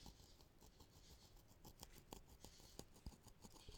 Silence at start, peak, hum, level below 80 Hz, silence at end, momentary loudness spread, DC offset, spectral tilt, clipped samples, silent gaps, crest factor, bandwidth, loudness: 0 s; -34 dBFS; none; -68 dBFS; 0 s; 8 LU; under 0.1%; -4 dB/octave; under 0.1%; none; 28 dB; 19 kHz; -64 LUFS